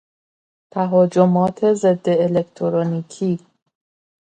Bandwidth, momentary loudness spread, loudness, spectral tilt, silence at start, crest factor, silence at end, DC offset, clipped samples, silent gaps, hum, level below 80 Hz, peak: 9.2 kHz; 9 LU; -18 LUFS; -8 dB/octave; 0.75 s; 18 dB; 0.95 s; under 0.1%; under 0.1%; none; none; -62 dBFS; -2 dBFS